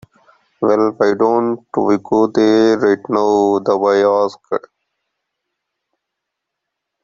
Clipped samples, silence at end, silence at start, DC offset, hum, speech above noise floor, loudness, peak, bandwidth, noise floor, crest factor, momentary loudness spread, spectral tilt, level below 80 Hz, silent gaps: under 0.1%; 2.45 s; 0.6 s; under 0.1%; none; 64 dB; -15 LUFS; -2 dBFS; 7.4 kHz; -79 dBFS; 14 dB; 7 LU; -6 dB/octave; -60 dBFS; none